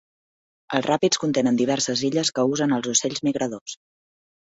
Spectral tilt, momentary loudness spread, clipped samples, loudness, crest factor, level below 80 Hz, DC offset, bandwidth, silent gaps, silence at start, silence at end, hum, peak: -3.5 dB/octave; 8 LU; under 0.1%; -22 LUFS; 18 dB; -64 dBFS; under 0.1%; 8 kHz; 3.61-3.66 s; 0.7 s; 0.75 s; none; -4 dBFS